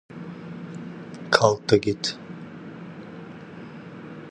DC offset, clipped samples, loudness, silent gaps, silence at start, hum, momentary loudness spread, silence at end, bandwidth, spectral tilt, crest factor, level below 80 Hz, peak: under 0.1%; under 0.1%; -22 LUFS; none; 0.1 s; none; 21 LU; 0 s; 11.5 kHz; -4.5 dB/octave; 28 dB; -58 dBFS; 0 dBFS